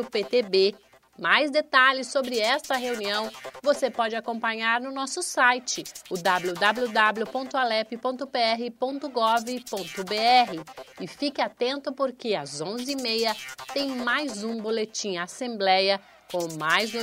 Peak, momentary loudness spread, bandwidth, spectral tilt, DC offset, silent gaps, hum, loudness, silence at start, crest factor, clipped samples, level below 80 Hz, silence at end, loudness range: -4 dBFS; 10 LU; 16 kHz; -2.5 dB/octave; under 0.1%; none; none; -25 LUFS; 0 s; 22 dB; under 0.1%; -72 dBFS; 0 s; 4 LU